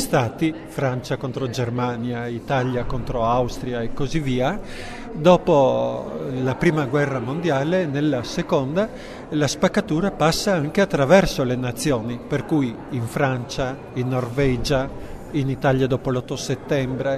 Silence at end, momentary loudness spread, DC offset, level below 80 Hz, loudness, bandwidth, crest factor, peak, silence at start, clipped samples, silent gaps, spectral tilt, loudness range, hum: 0 s; 10 LU; under 0.1%; -40 dBFS; -22 LUFS; 14 kHz; 20 dB; -2 dBFS; 0 s; under 0.1%; none; -6 dB/octave; 4 LU; none